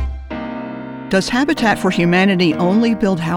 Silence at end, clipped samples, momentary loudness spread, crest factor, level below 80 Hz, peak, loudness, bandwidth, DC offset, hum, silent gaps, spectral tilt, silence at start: 0 s; under 0.1%; 14 LU; 14 dB; -34 dBFS; -2 dBFS; -16 LUFS; 13.5 kHz; under 0.1%; none; none; -6 dB/octave; 0 s